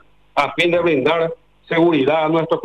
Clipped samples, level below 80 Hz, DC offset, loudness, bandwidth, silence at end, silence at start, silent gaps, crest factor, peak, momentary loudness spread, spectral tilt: under 0.1%; -58 dBFS; under 0.1%; -17 LUFS; 9.6 kHz; 0 s; 0.35 s; none; 12 dB; -6 dBFS; 9 LU; -6.5 dB/octave